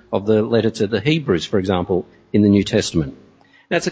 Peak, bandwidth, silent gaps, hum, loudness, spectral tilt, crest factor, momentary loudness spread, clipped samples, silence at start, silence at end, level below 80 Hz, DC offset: -2 dBFS; 8 kHz; none; none; -18 LUFS; -6 dB/octave; 16 dB; 8 LU; under 0.1%; 0.1 s; 0 s; -42 dBFS; under 0.1%